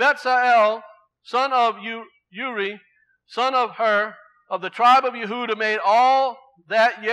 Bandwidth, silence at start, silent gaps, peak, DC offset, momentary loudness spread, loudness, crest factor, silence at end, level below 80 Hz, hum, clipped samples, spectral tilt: 11 kHz; 0 s; none; -6 dBFS; under 0.1%; 15 LU; -20 LUFS; 16 dB; 0 s; -88 dBFS; none; under 0.1%; -3 dB/octave